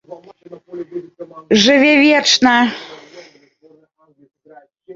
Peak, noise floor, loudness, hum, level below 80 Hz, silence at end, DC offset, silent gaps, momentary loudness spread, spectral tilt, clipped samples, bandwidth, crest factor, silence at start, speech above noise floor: 0 dBFS; -54 dBFS; -11 LUFS; none; -58 dBFS; 0 s; under 0.1%; none; 25 LU; -3 dB/octave; under 0.1%; 7.8 kHz; 18 dB; 0.1 s; 43 dB